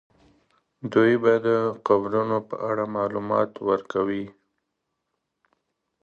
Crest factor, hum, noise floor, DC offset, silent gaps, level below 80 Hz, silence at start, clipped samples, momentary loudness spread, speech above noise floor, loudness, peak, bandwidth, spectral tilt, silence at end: 22 dB; none; -79 dBFS; under 0.1%; none; -66 dBFS; 0.85 s; under 0.1%; 8 LU; 56 dB; -24 LUFS; -4 dBFS; 7 kHz; -8 dB/octave; 1.7 s